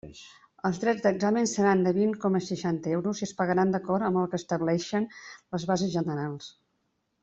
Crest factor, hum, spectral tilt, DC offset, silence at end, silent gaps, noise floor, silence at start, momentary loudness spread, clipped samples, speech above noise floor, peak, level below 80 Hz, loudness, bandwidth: 16 dB; none; -6 dB/octave; under 0.1%; 0.7 s; none; -76 dBFS; 0.05 s; 12 LU; under 0.1%; 49 dB; -12 dBFS; -66 dBFS; -28 LUFS; 8 kHz